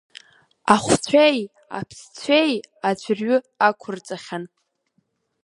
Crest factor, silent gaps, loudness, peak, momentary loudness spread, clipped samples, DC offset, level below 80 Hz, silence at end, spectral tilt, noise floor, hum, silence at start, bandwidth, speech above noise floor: 22 dB; none; -20 LUFS; 0 dBFS; 17 LU; under 0.1%; under 0.1%; -58 dBFS; 0.95 s; -4 dB/octave; -69 dBFS; none; 0.65 s; 11.5 kHz; 49 dB